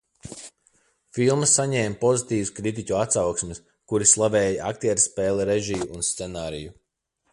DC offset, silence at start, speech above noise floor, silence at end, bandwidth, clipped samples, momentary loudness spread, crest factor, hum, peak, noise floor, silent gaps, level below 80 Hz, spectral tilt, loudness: under 0.1%; 0.25 s; 50 dB; 0.6 s; 11.5 kHz; under 0.1%; 18 LU; 20 dB; none; -4 dBFS; -73 dBFS; none; -52 dBFS; -3.5 dB/octave; -22 LUFS